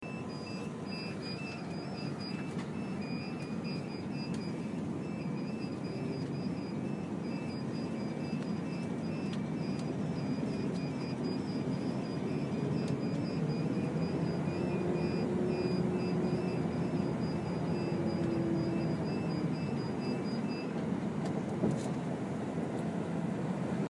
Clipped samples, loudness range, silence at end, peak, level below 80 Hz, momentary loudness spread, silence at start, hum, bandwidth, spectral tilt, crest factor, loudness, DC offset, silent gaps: under 0.1%; 5 LU; 0 s; -18 dBFS; -64 dBFS; 6 LU; 0 s; none; 11.5 kHz; -7.5 dB/octave; 18 dB; -36 LUFS; under 0.1%; none